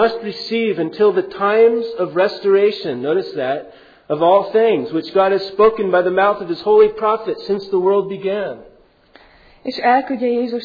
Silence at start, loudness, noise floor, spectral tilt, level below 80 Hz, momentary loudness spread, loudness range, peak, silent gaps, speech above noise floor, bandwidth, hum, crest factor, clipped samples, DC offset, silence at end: 0 s; -17 LUFS; -49 dBFS; -7 dB/octave; -56 dBFS; 9 LU; 5 LU; -2 dBFS; none; 33 dB; 5 kHz; none; 14 dB; under 0.1%; under 0.1%; 0 s